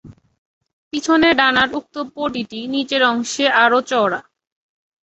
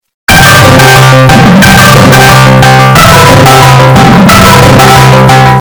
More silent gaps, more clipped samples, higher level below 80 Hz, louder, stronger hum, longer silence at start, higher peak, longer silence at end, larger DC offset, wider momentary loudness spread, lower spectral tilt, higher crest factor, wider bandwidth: first, 0.38-0.61 s, 0.73-0.91 s vs none; second, under 0.1% vs 80%; second, -56 dBFS vs -20 dBFS; second, -17 LUFS vs 0 LUFS; neither; second, 0.05 s vs 0.3 s; about the same, -2 dBFS vs 0 dBFS; first, 0.8 s vs 0 s; neither; first, 13 LU vs 1 LU; second, -3 dB/octave vs -4.5 dB/octave; first, 18 dB vs 0 dB; second, 8.2 kHz vs over 20 kHz